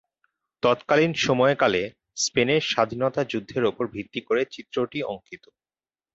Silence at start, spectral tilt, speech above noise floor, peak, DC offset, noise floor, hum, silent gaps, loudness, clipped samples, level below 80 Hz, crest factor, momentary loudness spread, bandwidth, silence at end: 0.65 s; -4 dB/octave; over 66 dB; -6 dBFS; under 0.1%; under -90 dBFS; none; none; -24 LUFS; under 0.1%; -60 dBFS; 20 dB; 11 LU; 8 kHz; 0.8 s